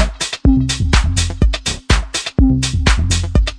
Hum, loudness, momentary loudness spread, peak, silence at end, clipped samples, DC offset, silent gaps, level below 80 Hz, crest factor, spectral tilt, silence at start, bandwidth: none; -16 LUFS; 3 LU; 0 dBFS; 0 s; under 0.1%; under 0.1%; none; -18 dBFS; 14 dB; -4.5 dB/octave; 0 s; 10.5 kHz